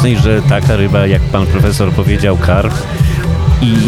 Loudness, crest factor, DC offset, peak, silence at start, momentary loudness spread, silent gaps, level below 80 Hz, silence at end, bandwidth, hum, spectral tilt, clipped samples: -11 LUFS; 10 dB; under 0.1%; 0 dBFS; 0 s; 3 LU; none; -18 dBFS; 0 s; 14.5 kHz; none; -7 dB/octave; under 0.1%